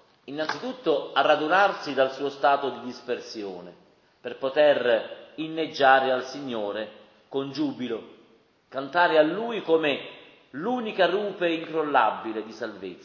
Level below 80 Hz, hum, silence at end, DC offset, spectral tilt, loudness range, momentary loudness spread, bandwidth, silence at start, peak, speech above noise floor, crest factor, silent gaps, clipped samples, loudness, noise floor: -78 dBFS; none; 0.05 s; under 0.1%; -5 dB/octave; 3 LU; 16 LU; 7 kHz; 0.25 s; -6 dBFS; 35 dB; 20 dB; none; under 0.1%; -25 LUFS; -60 dBFS